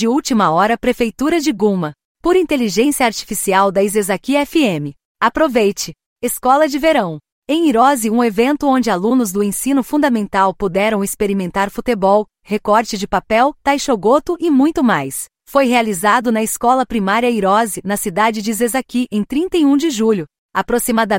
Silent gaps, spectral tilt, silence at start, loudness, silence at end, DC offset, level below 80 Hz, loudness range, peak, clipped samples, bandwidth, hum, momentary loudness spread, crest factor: 2.05-2.15 s, 5.05-5.15 s, 6.06-6.16 s, 7.32-7.42 s, 20.38-20.49 s; -4.5 dB/octave; 0 s; -15 LUFS; 0 s; under 0.1%; -44 dBFS; 2 LU; -2 dBFS; under 0.1%; 16.5 kHz; none; 6 LU; 14 dB